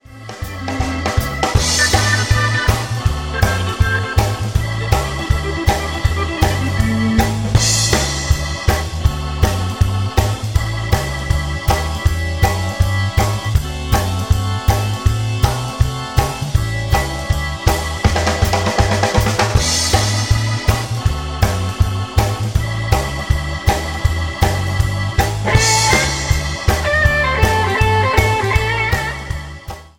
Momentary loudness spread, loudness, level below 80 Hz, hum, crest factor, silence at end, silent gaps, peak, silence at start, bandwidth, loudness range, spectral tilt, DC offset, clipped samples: 6 LU; -17 LUFS; -22 dBFS; none; 16 dB; 0.1 s; none; 0 dBFS; 0.1 s; 17 kHz; 3 LU; -4 dB/octave; under 0.1%; under 0.1%